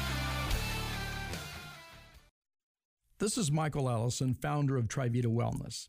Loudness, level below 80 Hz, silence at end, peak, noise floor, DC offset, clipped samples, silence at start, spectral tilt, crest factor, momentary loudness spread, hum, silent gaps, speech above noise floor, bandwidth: -34 LUFS; -46 dBFS; 0 s; -20 dBFS; -55 dBFS; under 0.1%; under 0.1%; 0 s; -5 dB/octave; 14 dB; 12 LU; none; 2.31-2.42 s, 2.63-2.75 s, 2.85-2.97 s; 23 dB; 15.5 kHz